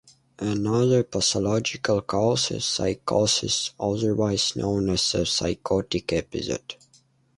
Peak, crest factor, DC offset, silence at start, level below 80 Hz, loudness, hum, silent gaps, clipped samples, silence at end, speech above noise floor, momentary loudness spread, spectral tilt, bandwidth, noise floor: -8 dBFS; 18 dB; under 0.1%; 0.4 s; -48 dBFS; -24 LUFS; none; none; under 0.1%; 0.65 s; 37 dB; 7 LU; -4 dB/octave; 11.5 kHz; -61 dBFS